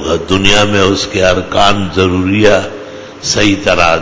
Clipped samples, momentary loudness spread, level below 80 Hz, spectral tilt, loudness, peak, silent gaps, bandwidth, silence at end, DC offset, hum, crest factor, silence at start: 0.8%; 9 LU; -30 dBFS; -4 dB/octave; -10 LUFS; 0 dBFS; none; 8 kHz; 0 s; under 0.1%; none; 10 dB; 0 s